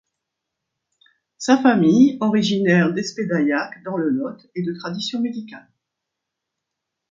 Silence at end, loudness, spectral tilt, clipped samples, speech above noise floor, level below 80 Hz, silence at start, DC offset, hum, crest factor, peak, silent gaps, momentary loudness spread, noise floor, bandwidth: 1.55 s; -19 LUFS; -6 dB/octave; under 0.1%; 63 dB; -66 dBFS; 1.4 s; under 0.1%; none; 20 dB; -2 dBFS; none; 13 LU; -82 dBFS; 7.6 kHz